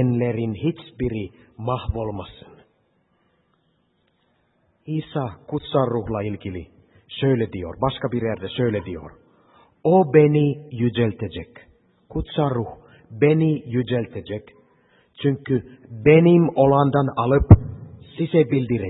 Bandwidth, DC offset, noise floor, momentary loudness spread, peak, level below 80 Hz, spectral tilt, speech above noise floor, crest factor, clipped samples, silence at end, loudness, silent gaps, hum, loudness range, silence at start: 4.1 kHz; under 0.1%; -66 dBFS; 19 LU; 0 dBFS; -38 dBFS; -12 dB/octave; 46 dB; 22 dB; under 0.1%; 0 s; -21 LUFS; none; none; 15 LU; 0 s